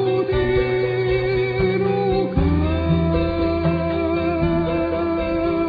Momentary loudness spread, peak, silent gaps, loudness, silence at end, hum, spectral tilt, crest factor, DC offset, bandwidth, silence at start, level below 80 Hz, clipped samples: 2 LU; -6 dBFS; none; -20 LUFS; 0 s; none; -10 dB/octave; 12 dB; under 0.1%; 5 kHz; 0 s; -32 dBFS; under 0.1%